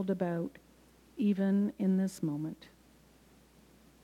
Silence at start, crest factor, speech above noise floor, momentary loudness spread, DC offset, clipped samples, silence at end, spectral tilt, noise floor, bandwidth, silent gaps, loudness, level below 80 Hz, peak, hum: 0 s; 14 dB; 30 dB; 13 LU; under 0.1%; under 0.1%; 1.5 s; -8 dB/octave; -62 dBFS; 13 kHz; none; -33 LUFS; -68 dBFS; -20 dBFS; none